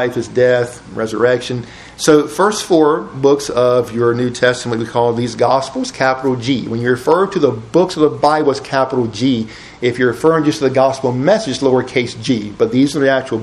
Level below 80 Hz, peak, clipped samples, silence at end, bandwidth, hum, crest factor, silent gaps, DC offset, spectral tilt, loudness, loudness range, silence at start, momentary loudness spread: -48 dBFS; 0 dBFS; under 0.1%; 0 s; 13 kHz; none; 14 dB; none; under 0.1%; -5.5 dB/octave; -15 LUFS; 1 LU; 0 s; 6 LU